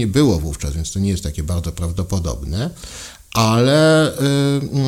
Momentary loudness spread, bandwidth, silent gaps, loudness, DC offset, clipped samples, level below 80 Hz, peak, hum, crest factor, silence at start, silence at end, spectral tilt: 11 LU; 16.5 kHz; none; -18 LUFS; under 0.1%; under 0.1%; -32 dBFS; -2 dBFS; none; 16 dB; 0 s; 0 s; -5.5 dB/octave